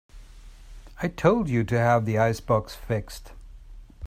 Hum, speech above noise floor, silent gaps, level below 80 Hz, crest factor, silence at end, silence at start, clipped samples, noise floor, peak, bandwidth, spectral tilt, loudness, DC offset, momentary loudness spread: none; 22 dB; none; -44 dBFS; 20 dB; 0 s; 0.15 s; under 0.1%; -45 dBFS; -8 dBFS; 15.5 kHz; -7 dB/octave; -24 LUFS; under 0.1%; 11 LU